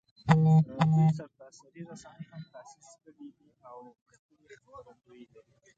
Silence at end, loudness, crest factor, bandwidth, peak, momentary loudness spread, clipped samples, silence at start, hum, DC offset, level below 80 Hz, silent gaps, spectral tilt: 0.95 s; -25 LUFS; 26 dB; 7.8 kHz; -6 dBFS; 28 LU; under 0.1%; 0.25 s; none; under 0.1%; -66 dBFS; 4.02-4.06 s, 4.19-4.29 s; -8 dB/octave